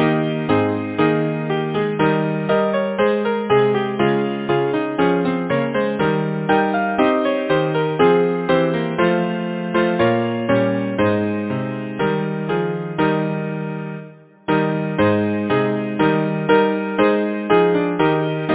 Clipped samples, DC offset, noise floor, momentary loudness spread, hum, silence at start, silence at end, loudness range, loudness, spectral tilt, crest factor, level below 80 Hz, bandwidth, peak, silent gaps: under 0.1%; under 0.1%; -39 dBFS; 6 LU; none; 0 s; 0 s; 3 LU; -19 LUFS; -11 dB/octave; 16 dB; -52 dBFS; 4 kHz; -2 dBFS; none